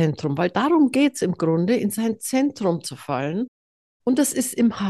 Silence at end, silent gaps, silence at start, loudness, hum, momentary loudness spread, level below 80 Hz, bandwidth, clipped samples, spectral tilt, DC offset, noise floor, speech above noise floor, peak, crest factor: 0 s; 3.48-4.00 s; 0 s; -22 LUFS; none; 9 LU; -64 dBFS; 13 kHz; under 0.1%; -5.5 dB/octave; under 0.1%; under -90 dBFS; over 69 dB; -8 dBFS; 14 dB